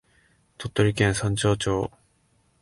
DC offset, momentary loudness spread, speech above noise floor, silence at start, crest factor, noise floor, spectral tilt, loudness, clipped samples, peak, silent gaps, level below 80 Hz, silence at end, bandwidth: under 0.1%; 11 LU; 42 dB; 0.6 s; 20 dB; -65 dBFS; -5 dB/octave; -24 LUFS; under 0.1%; -6 dBFS; none; -46 dBFS; 0.75 s; 11.5 kHz